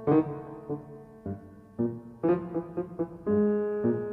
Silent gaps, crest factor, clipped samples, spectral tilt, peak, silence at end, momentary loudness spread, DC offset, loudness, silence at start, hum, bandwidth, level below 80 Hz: none; 16 dB; under 0.1%; -11.5 dB/octave; -14 dBFS; 0 s; 15 LU; under 0.1%; -31 LUFS; 0 s; none; 4 kHz; -62 dBFS